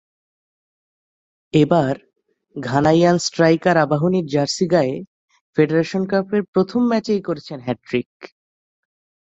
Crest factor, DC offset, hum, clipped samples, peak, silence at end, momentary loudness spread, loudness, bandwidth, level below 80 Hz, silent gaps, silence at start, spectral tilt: 18 dB; under 0.1%; none; under 0.1%; -2 dBFS; 1 s; 12 LU; -19 LUFS; 8.2 kHz; -58 dBFS; 5.07-5.28 s, 5.41-5.53 s, 6.48-6.53 s, 8.06-8.20 s; 1.55 s; -6 dB/octave